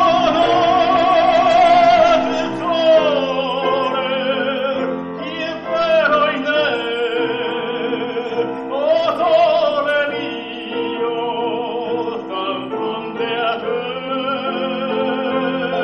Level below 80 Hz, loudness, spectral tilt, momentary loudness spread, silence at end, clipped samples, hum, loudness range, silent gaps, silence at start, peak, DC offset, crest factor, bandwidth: -52 dBFS; -17 LUFS; -5 dB/octave; 10 LU; 0 s; under 0.1%; none; 8 LU; none; 0 s; -4 dBFS; under 0.1%; 14 dB; 8.2 kHz